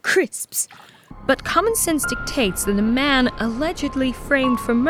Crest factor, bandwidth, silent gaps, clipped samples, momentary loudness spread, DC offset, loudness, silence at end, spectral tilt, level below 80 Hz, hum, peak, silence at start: 16 dB; 19.5 kHz; none; under 0.1%; 6 LU; under 0.1%; -20 LUFS; 0 s; -3 dB/octave; -38 dBFS; none; -4 dBFS; 0.05 s